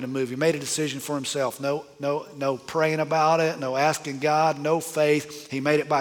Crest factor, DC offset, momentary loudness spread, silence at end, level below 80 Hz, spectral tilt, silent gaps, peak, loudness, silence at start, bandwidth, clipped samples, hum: 16 dB; under 0.1%; 7 LU; 0 s; -70 dBFS; -4.5 dB/octave; none; -8 dBFS; -25 LUFS; 0 s; 19.5 kHz; under 0.1%; none